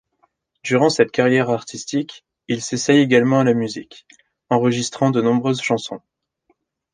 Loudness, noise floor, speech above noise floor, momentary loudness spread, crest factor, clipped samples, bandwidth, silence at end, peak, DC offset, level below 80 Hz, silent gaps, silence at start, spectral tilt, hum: -18 LUFS; -66 dBFS; 48 dB; 13 LU; 18 dB; under 0.1%; 10 kHz; 0.95 s; -2 dBFS; under 0.1%; -62 dBFS; none; 0.65 s; -5 dB/octave; none